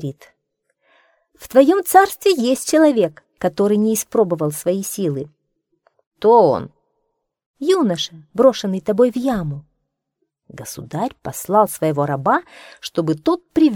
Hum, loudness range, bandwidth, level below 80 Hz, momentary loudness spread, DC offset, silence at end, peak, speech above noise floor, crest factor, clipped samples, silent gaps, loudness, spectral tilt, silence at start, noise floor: none; 5 LU; 19 kHz; -56 dBFS; 15 LU; under 0.1%; 0 s; 0 dBFS; 57 dB; 18 dB; under 0.1%; 6.07-6.11 s, 7.46-7.54 s; -17 LUFS; -5 dB/octave; 0 s; -74 dBFS